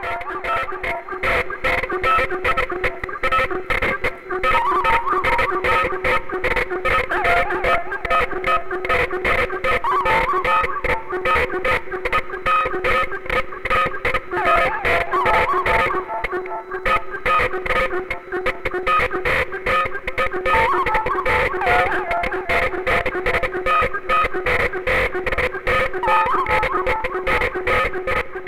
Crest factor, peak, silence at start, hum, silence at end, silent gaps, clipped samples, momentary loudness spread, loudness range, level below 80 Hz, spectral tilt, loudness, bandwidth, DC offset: 14 dB; -6 dBFS; 0 s; none; 0 s; none; under 0.1%; 6 LU; 2 LU; -34 dBFS; -5 dB/octave; -19 LUFS; 16 kHz; under 0.1%